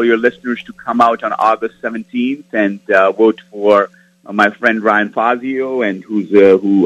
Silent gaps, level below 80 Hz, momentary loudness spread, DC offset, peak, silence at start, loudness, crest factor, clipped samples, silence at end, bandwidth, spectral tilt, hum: none; -60 dBFS; 11 LU; under 0.1%; 0 dBFS; 0 s; -14 LUFS; 14 dB; 0.1%; 0 s; 9.6 kHz; -6.5 dB/octave; none